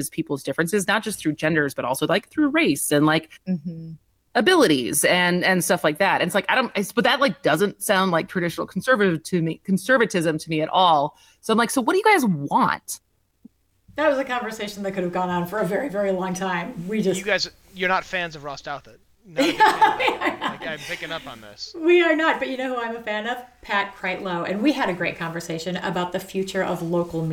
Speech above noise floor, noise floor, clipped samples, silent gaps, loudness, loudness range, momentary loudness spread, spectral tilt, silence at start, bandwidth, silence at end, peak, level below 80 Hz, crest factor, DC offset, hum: 33 dB; -55 dBFS; under 0.1%; none; -22 LUFS; 5 LU; 12 LU; -4 dB/octave; 0 s; 18 kHz; 0 s; -6 dBFS; -58 dBFS; 16 dB; under 0.1%; none